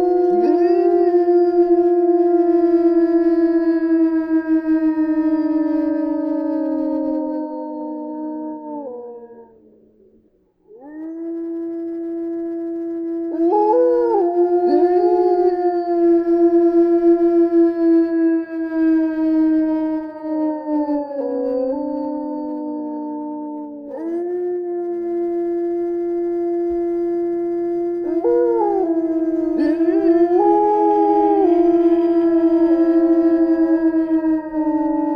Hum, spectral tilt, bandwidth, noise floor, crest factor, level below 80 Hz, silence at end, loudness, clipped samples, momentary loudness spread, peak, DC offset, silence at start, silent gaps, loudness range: none; -8.5 dB/octave; 5 kHz; -58 dBFS; 12 dB; -54 dBFS; 0 s; -18 LUFS; under 0.1%; 12 LU; -4 dBFS; under 0.1%; 0 s; none; 12 LU